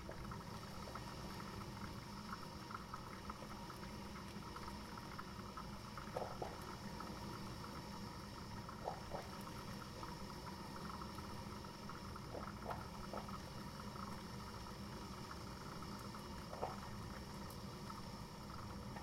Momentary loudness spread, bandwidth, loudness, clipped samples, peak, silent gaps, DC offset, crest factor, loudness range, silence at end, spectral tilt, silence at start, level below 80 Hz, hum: 3 LU; 16 kHz; -50 LUFS; under 0.1%; -28 dBFS; none; under 0.1%; 20 dB; 1 LU; 0 s; -5 dB/octave; 0 s; -60 dBFS; none